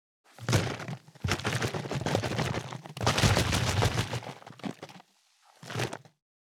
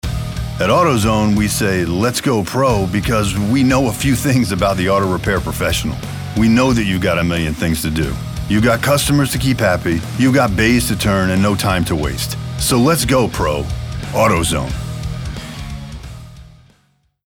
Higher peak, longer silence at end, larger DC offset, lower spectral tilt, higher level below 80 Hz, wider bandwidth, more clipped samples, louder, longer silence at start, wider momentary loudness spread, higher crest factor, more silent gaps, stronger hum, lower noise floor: second, -8 dBFS vs -2 dBFS; second, 0.5 s vs 0.8 s; neither; about the same, -4.5 dB/octave vs -5 dB/octave; second, -48 dBFS vs -30 dBFS; second, 17.5 kHz vs 20 kHz; neither; second, -30 LUFS vs -16 LUFS; first, 0.4 s vs 0.05 s; first, 16 LU vs 11 LU; first, 24 dB vs 14 dB; neither; neither; first, -65 dBFS vs -59 dBFS